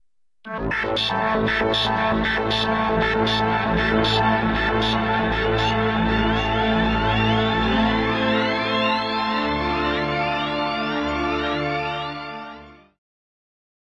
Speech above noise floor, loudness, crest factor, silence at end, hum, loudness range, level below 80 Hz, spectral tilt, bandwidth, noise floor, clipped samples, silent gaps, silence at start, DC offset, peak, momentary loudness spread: 22 dB; -21 LUFS; 16 dB; 1.25 s; none; 4 LU; -36 dBFS; -6 dB/octave; 11 kHz; -42 dBFS; under 0.1%; none; 0.45 s; 0.1%; -6 dBFS; 5 LU